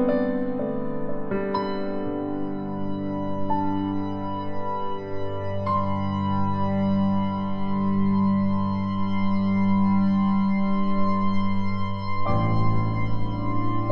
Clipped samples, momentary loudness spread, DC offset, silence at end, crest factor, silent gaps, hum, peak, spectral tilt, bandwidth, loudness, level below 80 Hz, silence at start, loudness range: under 0.1%; 8 LU; under 0.1%; 0 s; 14 dB; none; none; -8 dBFS; -10 dB/octave; 5.6 kHz; -26 LUFS; -42 dBFS; 0 s; 5 LU